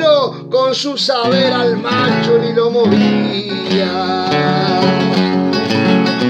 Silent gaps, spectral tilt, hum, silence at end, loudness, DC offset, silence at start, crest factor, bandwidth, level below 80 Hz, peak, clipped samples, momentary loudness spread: none; -6 dB/octave; none; 0 s; -14 LUFS; under 0.1%; 0 s; 14 dB; 9.2 kHz; -60 dBFS; 0 dBFS; under 0.1%; 4 LU